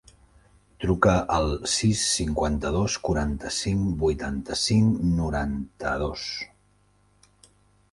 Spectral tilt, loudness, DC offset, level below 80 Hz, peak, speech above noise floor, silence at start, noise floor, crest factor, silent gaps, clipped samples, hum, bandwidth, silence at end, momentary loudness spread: -4.5 dB/octave; -25 LUFS; under 0.1%; -38 dBFS; -4 dBFS; 38 dB; 0.8 s; -63 dBFS; 22 dB; none; under 0.1%; 50 Hz at -50 dBFS; 11.5 kHz; 1.45 s; 10 LU